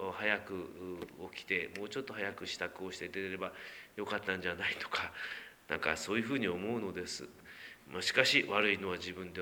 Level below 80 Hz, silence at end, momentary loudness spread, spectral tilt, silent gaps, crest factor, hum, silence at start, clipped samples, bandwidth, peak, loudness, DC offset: -70 dBFS; 0 s; 16 LU; -3.5 dB/octave; none; 28 dB; none; 0 s; under 0.1%; over 20 kHz; -10 dBFS; -36 LUFS; under 0.1%